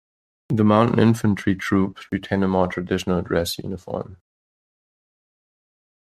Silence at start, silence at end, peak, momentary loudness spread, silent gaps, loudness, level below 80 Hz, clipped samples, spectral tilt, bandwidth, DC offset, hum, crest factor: 0.5 s; 1.95 s; -2 dBFS; 13 LU; none; -21 LUFS; -54 dBFS; under 0.1%; -6.5 dB/octave; 14 kHz; under 0.1%; none; 20 dB